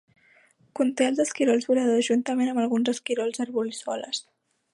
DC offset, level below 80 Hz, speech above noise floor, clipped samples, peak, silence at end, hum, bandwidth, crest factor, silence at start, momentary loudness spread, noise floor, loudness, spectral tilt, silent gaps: under 0.1%; -80 dBFS; 36 dB; under 0.1%; -10 dBFS; 0.55 s; none; 11.5 kHz; 16 dB; 0.75 s; 9 LU; -60 dBFS; -25 LUFS; -3.5 dB/octave; none